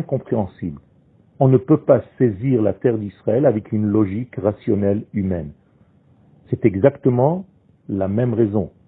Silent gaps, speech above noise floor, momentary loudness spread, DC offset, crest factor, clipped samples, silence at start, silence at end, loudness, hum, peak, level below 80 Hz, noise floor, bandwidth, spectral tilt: none; 36 dB; 11 LU; under 0.1%; 20 dB; under 0.1%; 0 s; 0.2 s; -19 LUFS; none; 0 dBFS; -52 dBFS; -54 dBFS; 3.9 kHz; -14 dB/octave